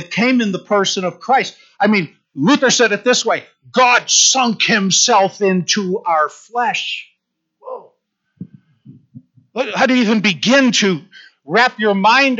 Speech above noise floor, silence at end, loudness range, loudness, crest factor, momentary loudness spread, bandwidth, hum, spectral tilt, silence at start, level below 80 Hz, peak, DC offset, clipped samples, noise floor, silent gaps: 55 dB; 0 s; 10 LU; -14 LUFS; 14 dB; 12 LU; 8 kHz; none; -2.5 dB/octave; 0 s; -70 dBFS; -2 dBFS; under 0.1%; under 0.1%; -70 dBFS; none